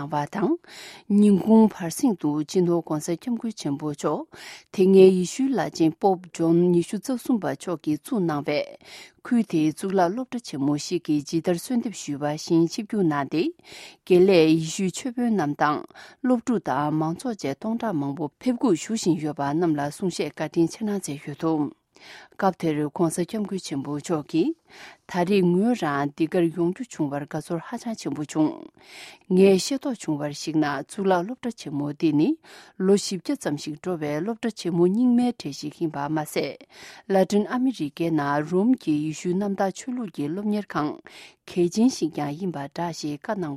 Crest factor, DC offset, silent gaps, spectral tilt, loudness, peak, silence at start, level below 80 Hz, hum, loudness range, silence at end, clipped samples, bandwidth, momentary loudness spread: 22 dB; under 0.1%; none; -6 dB/octave; -24 LUFS; -2 dBFS; 0 s; -66 dBFS; none; 5 LU; 0 s; under 0.1%; 14.5 kHz; 12 LU